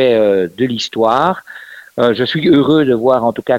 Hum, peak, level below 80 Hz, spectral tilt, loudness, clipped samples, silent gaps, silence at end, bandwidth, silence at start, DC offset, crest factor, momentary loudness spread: none; 0 dBFS; -52 dBFS; -6 dB/octave; -13 LUFS; under 0.1%; none; 0 s; 16 kHz; 0 s; under 0.1%; 12 dB; 13 LU